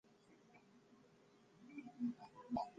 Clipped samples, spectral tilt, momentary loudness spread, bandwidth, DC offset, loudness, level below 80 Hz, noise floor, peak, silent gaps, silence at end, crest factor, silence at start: under 0.1%; -7 dB/octave; 23 LU; 7.6 kHz; under 0.1%; -49 LUFS; -78 dBFS; -70 dBFS; -30 dBFS; none; 0 s; 22 dB; 0.1 s